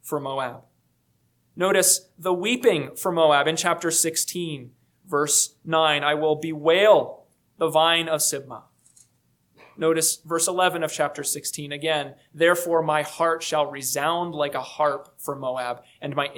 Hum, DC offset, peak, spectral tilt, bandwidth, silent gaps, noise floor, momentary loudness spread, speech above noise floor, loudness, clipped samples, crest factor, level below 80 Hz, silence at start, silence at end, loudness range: none; under 0.1%; -4 dBFS; -2.5 dB/octave; 19 kHz; none; -67 dBFS; 12 LU; 44 dB; -22 LUFS; under 0.1%; 20 dB; -74 dBFS; 0.05 s; 0 s; 4 LU